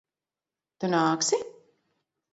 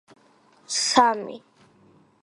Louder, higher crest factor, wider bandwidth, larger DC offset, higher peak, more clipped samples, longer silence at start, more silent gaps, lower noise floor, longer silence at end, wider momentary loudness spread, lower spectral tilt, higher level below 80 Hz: second, -26 LUFS vs -21 LUFS; second, 20 dB vs 26 dB; second, 8 kHz vs 11.5 kHz; neither; second, -12 dBFS vs -2 dBFS; neither; about the same, 0.8 s vs 0.7 s; neither; first, under -90 dBFS vs -58 dBFS; about the same, 0.8 s vs 0.85 s; second, 11 LU vs 20 LU; first, -3.5 dB/octave vs -1 dB/octave; about the same, -76 dBFS vs -72 dBFS